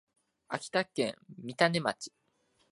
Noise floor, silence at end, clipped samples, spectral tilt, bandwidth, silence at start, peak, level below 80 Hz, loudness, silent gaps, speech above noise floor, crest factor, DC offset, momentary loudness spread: -73 dBFS; 0.65 s; under 0.1%; -4.5 dB/octave; 11.5 kHz; 0.5 s; -10 dBFS; -76 dBFS; -32 LUFS; none; 41 dB; 26 dB; under 0.1%; 17 LU